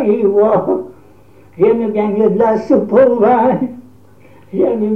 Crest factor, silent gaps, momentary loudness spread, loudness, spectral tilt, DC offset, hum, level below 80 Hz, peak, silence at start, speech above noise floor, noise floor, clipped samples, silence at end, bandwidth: 14 dB; none; 10 LU; -13 LUFS; -9.5 dB/octave; 0.5%; none; -54 dBFS; 0 dBFS; 0 s; 32 dB; -44 dBFS; under 0.1%; 0 s; 6.2 kHz